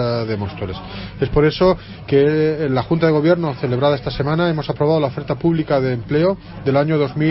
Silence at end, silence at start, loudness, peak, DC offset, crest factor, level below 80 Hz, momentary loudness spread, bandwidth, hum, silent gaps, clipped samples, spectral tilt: 0 s; 0 s; -18 LUFS; -2 dBFS; under 0.1%; 16 dB; -38 dBFS; 9 LU; 5.8 kHz; none; none; under 0.1%; -11 dB/octave